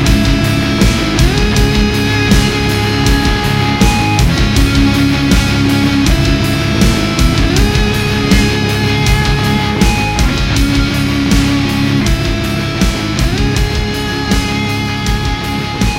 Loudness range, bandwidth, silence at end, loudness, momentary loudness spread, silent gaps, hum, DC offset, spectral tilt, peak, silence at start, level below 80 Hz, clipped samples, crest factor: 3 LU; 16.5 kHz; 0 s; -12 LUFS; 4 LU; none; none; under 0.1%; -5 dB/octave; 0 dBFS; 0 s; -18 dBFS; under 0.1%; 12 dB